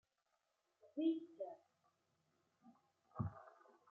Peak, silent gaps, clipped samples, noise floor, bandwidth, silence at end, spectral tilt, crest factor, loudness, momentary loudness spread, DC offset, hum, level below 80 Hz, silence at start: -30 dBFS; none; under 0.1%; -86 dBFS; 4.2 kHz; 0.4 s; -8.5 dB/octave; 20 dB; -46 LUFS; 21 LU; under 0.1%; none; -74 dBFS; 0.85 s